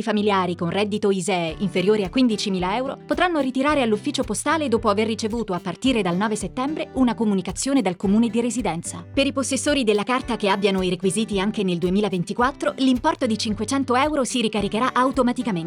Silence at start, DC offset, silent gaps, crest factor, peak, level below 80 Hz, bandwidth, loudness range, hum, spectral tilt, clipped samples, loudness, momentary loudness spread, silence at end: 0 s; under 0.1%; none; 16 dB; -6 dBFS; -46 dBFS; 15 kHz; 1 LU; none; -4.5 dB/octave; under 0.1%; -22 LUFS; 5 LU; 0 s